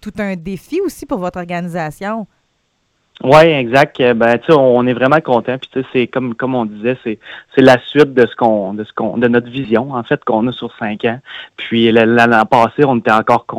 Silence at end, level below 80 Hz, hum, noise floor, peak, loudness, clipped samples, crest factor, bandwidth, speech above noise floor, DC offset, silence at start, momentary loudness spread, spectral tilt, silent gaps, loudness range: 0 s; -50 dBFS; none; -63 dBFS; 0 dBFS; -13 LUFS; 0.2%; 14 dB; 15 kHz; 50 dB; under 0.1%; 0.05 s; 13 LU; -6.5 dB/octave; none; 5 LU